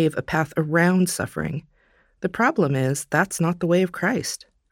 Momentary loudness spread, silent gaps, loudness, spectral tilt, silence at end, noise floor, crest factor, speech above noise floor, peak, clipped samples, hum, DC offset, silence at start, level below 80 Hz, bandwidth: 11 LU; none; -22 LUFS; -5.5 dB/octave; 0.35 s; -61 dBFS; 18 dB; 39 dB; -4 dBFS; under 0.1%; none; under 0.1%; 0 s; -54 dBFS; 17 kHz